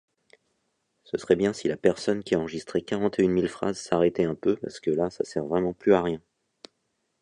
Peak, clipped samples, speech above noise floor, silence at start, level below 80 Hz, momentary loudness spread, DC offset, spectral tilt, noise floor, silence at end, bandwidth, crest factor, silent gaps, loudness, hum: -6 dBFS; under 0.1%; 51 dB; 1.15 s; -58 dBFS; 8 LU; under 0.1%; -6 dB/octave; -76 dBFS; 1.05 s; 10.5 kHz; 22 dB; none; -26 LUFS; none